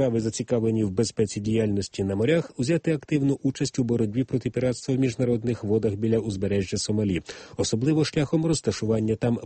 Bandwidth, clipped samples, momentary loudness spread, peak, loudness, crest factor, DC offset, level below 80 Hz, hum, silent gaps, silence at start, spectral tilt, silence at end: 8.8 kHz; under 0.1%; 3 LU; -10 dBFS; -25 LUFS; 14 dB; under 0.1%; -52 dBFS; none; none; 0 s; -6 dB/octave; 0 s